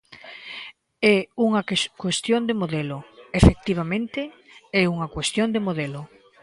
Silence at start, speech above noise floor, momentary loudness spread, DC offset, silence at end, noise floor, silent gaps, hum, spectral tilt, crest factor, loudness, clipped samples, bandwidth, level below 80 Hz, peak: 0.1 s; 20 dB; 18 LU; under 0.1%; 0.35 s; -42 dBFS; none; none; -5.5 dB/octave; 24 dB; -23 LUFS; under 0.1%; 11.5 kHz; -36 dBFS; 0 dBFS